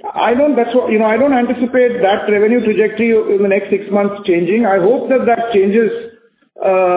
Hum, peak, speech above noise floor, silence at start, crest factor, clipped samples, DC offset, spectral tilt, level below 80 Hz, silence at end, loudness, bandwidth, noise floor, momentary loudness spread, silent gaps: none; -2 dBFS; 32 dB; 0.05 s; 12 dB; under 0.1%; under 0.1%; -10 dB/octave; -54 dBFS; 0 s; -13 LUFS; 4 kHz; -45 dBFS; 4 LU; none